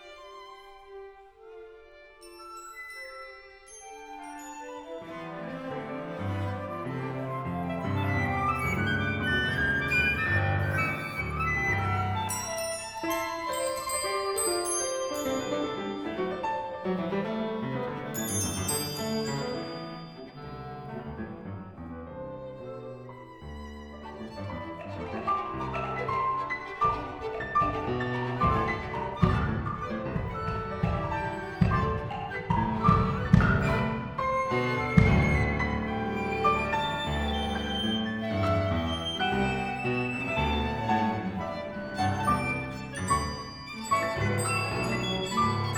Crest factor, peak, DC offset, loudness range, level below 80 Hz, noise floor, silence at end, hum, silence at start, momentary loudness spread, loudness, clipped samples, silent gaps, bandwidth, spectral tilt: 26 dB; -4 dBFS; under 0.1%; 14 LU; -42 dBFS; -51 dBFS; 0 s; none; 0 s; 16 LU; -29 LUFS; under 0.1%; none; over 20 kHz; -5 dB/octave